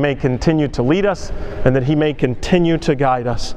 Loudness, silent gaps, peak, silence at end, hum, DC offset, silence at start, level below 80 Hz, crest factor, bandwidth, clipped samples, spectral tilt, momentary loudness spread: -17 LUFS; none; 0 dBFS; 0 s; none; under 0.1%; 0 s; -30 dBFS; 16 dB; 10 kHz; under 0.1%; -7 dB/octave; 5 LU